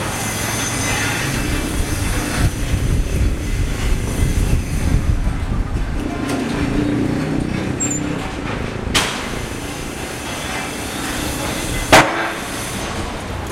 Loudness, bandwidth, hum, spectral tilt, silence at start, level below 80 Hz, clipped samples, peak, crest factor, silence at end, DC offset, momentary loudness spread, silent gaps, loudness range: -20 LUFS; 16 kHz; none; -4 dB/octave; 0 s; -24 dBFS; under 0.1%; 0 dBFS; 20 dB; 0 s; under 0.1%; 6 LU; none; 3 LU